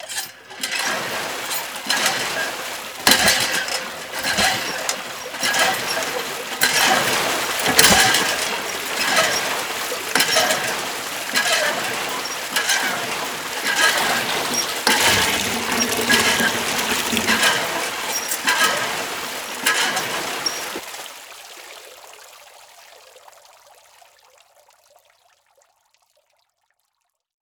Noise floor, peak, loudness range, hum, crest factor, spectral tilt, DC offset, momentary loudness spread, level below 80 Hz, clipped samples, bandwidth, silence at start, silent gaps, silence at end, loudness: -74 dBFS; 0 dBFS; 7 LU; none; 22 dB; -0.5 dB/octave; under 0.1%; 12 LU; -54 dBFS; under 0.1%; over 20 kHz; 0 s; none; 4.25 s; -19 LUFS